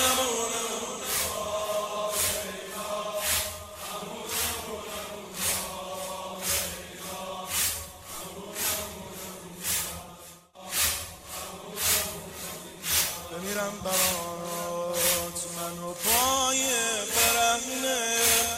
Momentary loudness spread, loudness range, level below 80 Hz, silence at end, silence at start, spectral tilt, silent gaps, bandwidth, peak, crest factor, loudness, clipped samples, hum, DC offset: 15 LU; 6 LU; -54 dBFS; 0 s; 0 s; -1 dB/octave; none; 16.5 kHz; -10 dBFS; 20 dB; -28 LUFS; under 0.1%; none; under 0.1%